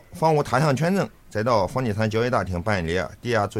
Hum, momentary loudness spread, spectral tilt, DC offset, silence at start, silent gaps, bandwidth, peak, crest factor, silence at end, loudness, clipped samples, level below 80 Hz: none; 6 LU; -6.5 dB/octave; under 0.1%; 0.1 s; none; 16 kHz; -6 dBFS; 18 dB; 0 s; -23 LUFS; under 0.1%; -46 dBFS